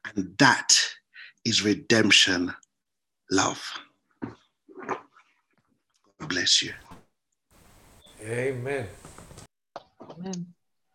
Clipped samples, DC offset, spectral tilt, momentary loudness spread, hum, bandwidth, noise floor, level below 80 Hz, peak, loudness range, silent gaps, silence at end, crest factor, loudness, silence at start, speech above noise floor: under 0.1%; under 0.1%; -2 dB/octave; 25 LU; none; 16 kHz; -86 dBFS; -60 dBFS; -2 dBFS; 14 LU; none; 0.45 s; 26 dB; -23 LUFS; 0.05 s; 62 dB